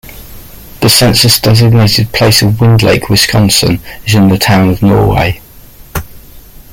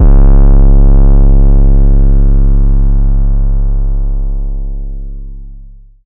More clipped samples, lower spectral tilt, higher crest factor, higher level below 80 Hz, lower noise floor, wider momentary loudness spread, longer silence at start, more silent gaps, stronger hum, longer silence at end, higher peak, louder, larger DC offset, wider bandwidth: first, 0.1% vs under 0.1%; second, -4.5 dB/octave vs -13 dB/octave; about the same, 8 dB vs 6 dB; second, -28 dBFS vs -6 dBFS; about the same, -34 dBFS vs -32 dBFS; second, 10 LU vs 17 LU; about the same, 0.05 s vs 0 s; neither; neither; second, 0.3 s vs 0.45 s; about the same, 0 dBFS vs 0 dBFS; first, -8 LUFS vs -12 LUFS; neither; first, 17.5 kHz vs 1.6 kHz